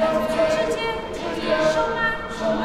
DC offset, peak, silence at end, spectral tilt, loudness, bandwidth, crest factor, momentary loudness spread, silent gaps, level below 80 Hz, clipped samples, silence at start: under 0.1%; -8 dBFS; 0 s; -4.5 dB/octave; -22 LUFS; 14.5 kHz; 14 dB; 6 LU; none; -42 dBFS; under 0.1%; 0 s